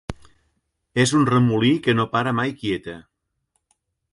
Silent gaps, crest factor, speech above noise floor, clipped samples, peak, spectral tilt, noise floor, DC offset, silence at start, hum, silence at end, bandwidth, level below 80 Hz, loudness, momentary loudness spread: none; 16 dB; 54 dB; under 0.1%; -6 dBFS; -5.5 dB/octave; -73 dBFS; under 0.1%; 0.1 s; none; 1.1 s; 11.5 kHz; -52 dBFS; -20 LUFS; 17 LU